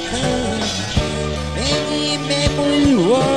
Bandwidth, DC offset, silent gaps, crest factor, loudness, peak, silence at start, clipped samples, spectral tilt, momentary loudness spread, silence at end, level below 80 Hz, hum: 12.5 kHz; 0.7%; none; 14 dB; -18 LUFS; -2 dBFS; 0 s; under 0.1%; -4.5 dB/octave; 7 LU; 0 s; -32 dBFS; none